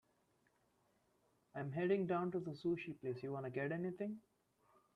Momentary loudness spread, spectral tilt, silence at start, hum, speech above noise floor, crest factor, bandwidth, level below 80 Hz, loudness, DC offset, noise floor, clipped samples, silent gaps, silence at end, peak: 10 LU; -9 dB/octave; 1.55 s; none; 37 dB; 18 dB; 6.2 kHz; -82 dBFS; -42 LUFS; under 0.1%; -79 dBFS; under 0.1%; none; 0.75 s; -26 dBFS